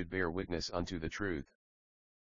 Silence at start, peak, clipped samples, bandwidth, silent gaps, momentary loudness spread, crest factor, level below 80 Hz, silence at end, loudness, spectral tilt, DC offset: 0 s; -20 dBFS; under 0.1%; 7.4 kHz; none; 6 LU; 20 dB; -54 dBFS; 0.8 s; -39 LUFS; -4 dB/octave; 0.2%